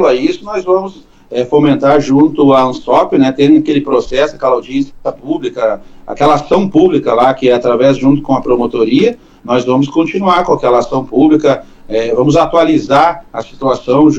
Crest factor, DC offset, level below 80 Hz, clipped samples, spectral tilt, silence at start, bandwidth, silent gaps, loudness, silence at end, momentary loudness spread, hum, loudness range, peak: 10 dB; under 0.1%; -38 dBFS; under 0.1%; -7 dB/octave; 0 s; 8 kHz; none; -11 LUFS; 0 s; 10 LU; none; 3 LU; 0 dBFS